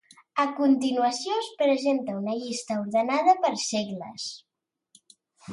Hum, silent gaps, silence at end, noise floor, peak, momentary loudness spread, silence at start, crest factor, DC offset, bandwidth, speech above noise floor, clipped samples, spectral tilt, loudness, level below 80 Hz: none; none; 0 s; -73 dBFS; -8 dBFS; 12 LU; 0.35 s; 18 dB; under 0.1%; 11.5 kHz; 47 dB; under 0.1%; -4 dB/octave; -26 LUFS; -76 dBFS